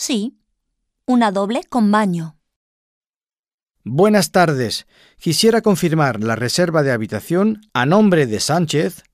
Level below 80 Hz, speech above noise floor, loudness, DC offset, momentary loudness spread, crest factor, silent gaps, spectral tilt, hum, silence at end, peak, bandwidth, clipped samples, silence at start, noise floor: -56 dBFS; over 74 dB; -17 LUFS; under 0.1%; 10 LU; 16 dB; 2.56-3.01 s, 3.09-3.21 s, 3.39-3.43 s, 3.54-3.58 s; -5 dB/octave; none; 0.15 s; -2 dBFS; 16 kHz; under 0.1%; 0 s; under -90 dBFS